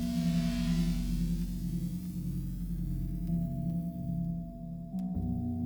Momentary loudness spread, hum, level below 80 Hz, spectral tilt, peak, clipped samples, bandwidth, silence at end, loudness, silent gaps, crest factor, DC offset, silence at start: 7 LU; none; -40 dBFS; -7.5 dB/octave; -20 dBFS; under 0.1%; over 20 kHz; 0 s; -35 LUFS; none; 14 dB; under 0.1%; 0 s